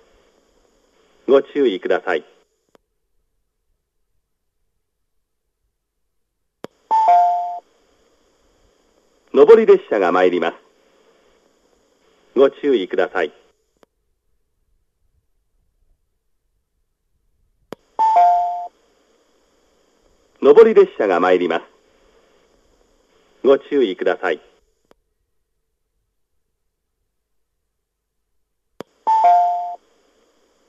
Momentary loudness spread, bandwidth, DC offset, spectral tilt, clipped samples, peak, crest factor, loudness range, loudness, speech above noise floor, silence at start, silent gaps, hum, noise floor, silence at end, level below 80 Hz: 16 LU; 7.6 kHz; under 0.1%; -6 dB/octave; under 0.1%; 0 dBFS; 20 dB; 9 LU; -16 LUFS; 60 dB; 1.3 s; none; none; -75 dBFS; 0.95 s; -66 dBFS